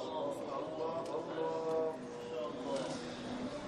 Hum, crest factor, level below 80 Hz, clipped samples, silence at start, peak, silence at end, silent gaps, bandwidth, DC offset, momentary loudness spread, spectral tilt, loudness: none; 14 dB; -70 dBFS; under 0.1%; 0 s; -26 dBFS; 0 s; none; 12.5 kHz; under 0.1%; 6 LU; -5 dB/octave; -40 LUFS